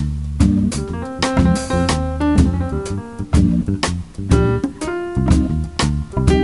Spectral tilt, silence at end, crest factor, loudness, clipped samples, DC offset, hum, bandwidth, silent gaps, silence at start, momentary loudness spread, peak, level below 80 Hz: -6.5 dB/octave; 0 s; 16 dB; -18 LUFS; under 0.1%; 0.5%; none; 11.5 kHz; none; 0 s; 8 LU; 0 dBFS; -24 dBFS